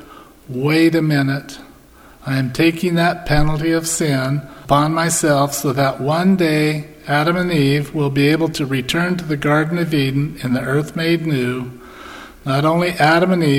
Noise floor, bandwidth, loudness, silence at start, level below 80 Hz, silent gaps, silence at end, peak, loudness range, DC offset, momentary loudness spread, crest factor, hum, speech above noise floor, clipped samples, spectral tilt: -44 dBFS; 16.5 kHz; -17 LUFS; 0 s; -36 dBFS; none; 0 s; 0 dBFS; 2 LU; under 0.1%; 11 LU; 16 dB; none; 28 dB; under 0.1%; -5.5 dB/octave